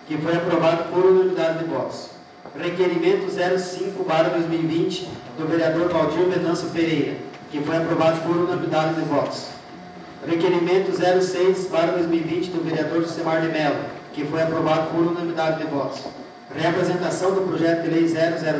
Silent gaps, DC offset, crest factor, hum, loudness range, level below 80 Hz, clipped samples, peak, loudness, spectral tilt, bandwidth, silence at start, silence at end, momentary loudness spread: none; under 0.1%; 16 dB; none; 2 LU; -60 dBFS; under 0.1%; -6 dBFS; -22 LUFS; -6 dB/octave; 8 kHz; 0 s; 0 s; 12 LU